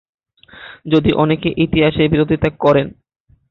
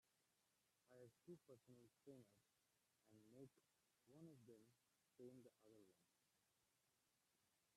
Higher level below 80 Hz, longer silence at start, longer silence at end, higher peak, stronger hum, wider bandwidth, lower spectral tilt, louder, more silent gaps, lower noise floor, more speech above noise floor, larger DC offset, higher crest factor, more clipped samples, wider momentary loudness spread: first, -38 dBFS vs under -90 dBFS; first, 0.55 s vs 0.05 s; first, 0.6 s vs 0 s; first, -2 dBFS vs -52 dBFS; neither; second, 6 kHz vs 13 kHz; first, -9 dB/octave vs -6 dB/octave; first, -15 LUFS vs -67 LUFS; neither; second, -41 dBFS vs -88 dBFS; first, 26 dB vs 20 dB; neither; about the same, 16 dB vs 20 dB; neither; first, 10 LU vs 3 LU